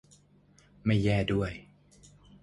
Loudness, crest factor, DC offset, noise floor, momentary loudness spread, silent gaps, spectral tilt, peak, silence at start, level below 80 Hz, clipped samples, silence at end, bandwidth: -29 LUFS; 18 dB; under 0.1%; -62 dBFS; 11 LU; none; -7.5 dB/octave; -14 dBFS; 0.85 s; -50 dBFS; under 0.1%; 0.8 s; 11 kHz